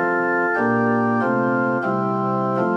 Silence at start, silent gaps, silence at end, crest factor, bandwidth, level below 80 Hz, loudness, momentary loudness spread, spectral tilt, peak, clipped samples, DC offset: 0 s; none; 0 s; 12 dB; 7.2 kHz; -62 dBFS; -20 LUFS; 3 LU; -9 dB/octave; -8 dBFS; under 0.1%; under 0.1%